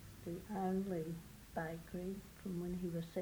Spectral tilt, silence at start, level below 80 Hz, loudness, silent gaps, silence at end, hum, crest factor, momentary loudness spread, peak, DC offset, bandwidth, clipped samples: -7 dB/octave; 0 s; -62 dBFS; -44 LUFS; none; 0 s; none; 16 dB; 9 LU; -28 dBFS; under 0.1%; over 20 kHz; under 0.1%